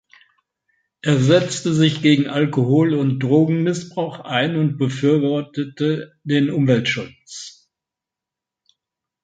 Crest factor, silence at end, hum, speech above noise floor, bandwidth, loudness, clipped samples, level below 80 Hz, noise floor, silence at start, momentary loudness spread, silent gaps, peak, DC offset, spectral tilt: 18 dB; 1.75 s; none; 68 dB; 9.4 kHz; -19 LUFS; under 0.1%; -62 dBFS; -86 dBFS; 1.05 s; 11 LU; none; -2 dBFS; under 0.1%; -6 dB/octave